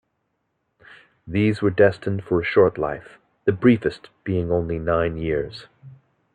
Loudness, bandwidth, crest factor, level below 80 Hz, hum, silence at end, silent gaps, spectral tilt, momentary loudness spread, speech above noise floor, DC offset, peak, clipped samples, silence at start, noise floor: -21 LUFS; 9.4 kHz; 18 dB; -48 dBFS; none; 0.45 s; none; -8.5 dB/octave; 10 LU; 53 dB; under 0.1%; -4 dBFS; under 0.1%; 1.25 s; -74 dBFS